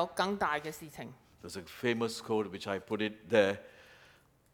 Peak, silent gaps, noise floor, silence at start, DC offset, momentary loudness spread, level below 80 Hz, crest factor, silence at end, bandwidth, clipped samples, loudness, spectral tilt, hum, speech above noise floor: -12 dBFS; none; -64 dBFS; 0 s; under 0.1%; 18 LU; -70 dBFS; 24 dB; 0.6 s; 19.5 kHz; under 0.1%; -33 LUFS; -4.5 dB/octave; none; 30 dB